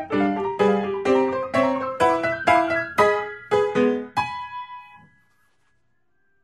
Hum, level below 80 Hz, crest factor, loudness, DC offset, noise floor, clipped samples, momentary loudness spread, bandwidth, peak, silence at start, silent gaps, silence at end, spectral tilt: none; -58 dBFS; 18 dB; -22 LUFS; under 0.1%; -71 dBFS; under 0.1%; 11 LU; 13 kHz; -4 dBFS; 0 s; none; 1.45 s; -5.5 dB/octave